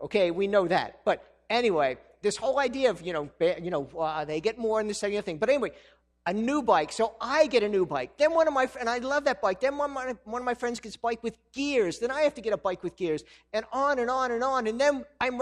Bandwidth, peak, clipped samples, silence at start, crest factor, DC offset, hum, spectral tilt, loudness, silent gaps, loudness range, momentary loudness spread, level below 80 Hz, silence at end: 11.5 kHz; -10 dBFS; under 0.1%; 0 s; 18 dB; under 0.1%; none; -4.5 dB/octave; -28 LUFS; none; 4 LU; 9 LU; -60 dBFS; 0 s